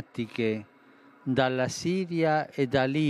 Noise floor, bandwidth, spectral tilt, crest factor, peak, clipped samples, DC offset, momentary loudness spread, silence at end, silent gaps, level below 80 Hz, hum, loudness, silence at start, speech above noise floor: -56 dBFS; 13 kHz; -6 dB/octave; 20 dB; -8 dBFS; under 0.1%; under 0.1%; 8 LU; 0 s; none; -64 dBFS; none; -28 LUFS; 0 s; 29 dB